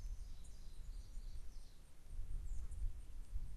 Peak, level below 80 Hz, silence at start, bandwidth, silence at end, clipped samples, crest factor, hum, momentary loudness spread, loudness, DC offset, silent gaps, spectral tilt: -30 dBFS; -46 dBFS; 0 s; 12.5 kHz; 0 s; under 0.1%; 14 dB; none; 9 LU; -55 LUFS; under 0.1%; none; -5 dB/octave